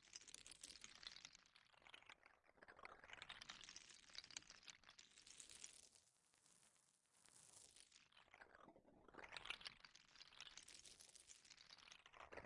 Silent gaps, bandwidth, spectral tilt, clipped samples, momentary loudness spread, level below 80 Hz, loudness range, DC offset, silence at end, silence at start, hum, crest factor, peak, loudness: none; 12 kHz; 0 dB/octave; under 0.1%; 11 LU; -86 dBFS; 6 LU; under 0.1%; 0 s; 0 s; none; 30 dB; -34 dBFS; -61 LUFS